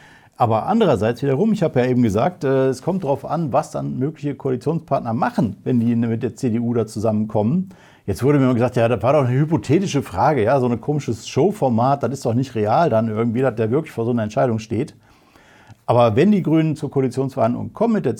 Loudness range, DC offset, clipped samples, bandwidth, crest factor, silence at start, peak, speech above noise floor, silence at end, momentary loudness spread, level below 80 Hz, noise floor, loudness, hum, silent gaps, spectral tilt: 3 LU; under 0.1%; under 0.1%; 15 kHz; 16 dB; 0.4 s; -2 dBFS; 32 dB; 0 s; 7 LU; -56 dBFS; -50 dBFS; -19 LUFS; none; none; -7.5 dB/octave